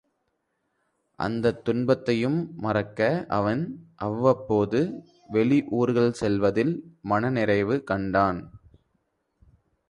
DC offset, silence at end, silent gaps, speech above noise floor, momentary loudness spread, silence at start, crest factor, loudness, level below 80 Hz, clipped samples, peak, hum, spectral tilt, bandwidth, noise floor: under 0.1%; 1.35 s; none; 51 dB; 8 LU; 1.2 s; 20 dB; -25 LUFS; -54 dBFS; under 0.1%; -6 dBFS; none; -7.5 dB/octave; 11 kHz; -76 dBFS